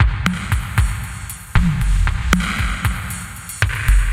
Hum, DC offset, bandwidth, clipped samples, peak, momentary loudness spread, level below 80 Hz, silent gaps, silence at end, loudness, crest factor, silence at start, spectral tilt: none; under 0.1%; 16.5 kHz; under 0.1%; 0 dBFS; 10 LU; -20 dBFS; none; 0 s; -20 LUFS; 18 dB; 0 s; -4.5 dB/octave